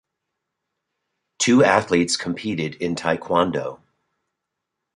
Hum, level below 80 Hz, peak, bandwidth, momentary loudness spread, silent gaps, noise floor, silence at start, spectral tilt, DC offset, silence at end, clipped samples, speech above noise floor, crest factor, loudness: none; -56 dBFS; 0 dBFS; 11.5 kHz; 10 LU; none; -81 dBFS; 1.4 s; -4 dB/octave; under 0.1%; 1.2 s; under 0.1%; 61 dB; 22 dB; -20 LUFS